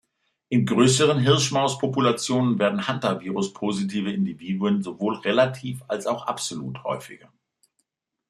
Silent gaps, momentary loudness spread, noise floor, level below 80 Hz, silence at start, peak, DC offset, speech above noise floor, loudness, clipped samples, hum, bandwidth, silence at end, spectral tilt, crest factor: none; 11 LU; -75 dBFS; -64 dBFS; 0.5 s; -4 dBFS; under 0.1%; 52 dB; -23 LUFS; under 0.1%; none; 13 kHz; 1.15 s; -5 dB/octave; 20 dB